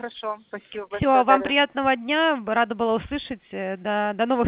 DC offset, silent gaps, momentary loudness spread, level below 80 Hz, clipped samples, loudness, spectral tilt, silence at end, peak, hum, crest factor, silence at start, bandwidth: under 0.1%; none; 15 LU; -50 dBFS; under 0.1%; -22 LUFS; -8.5 dB/octave; 0 s; -2 dBFS; none; 20 dB; 0 s; 4 kHz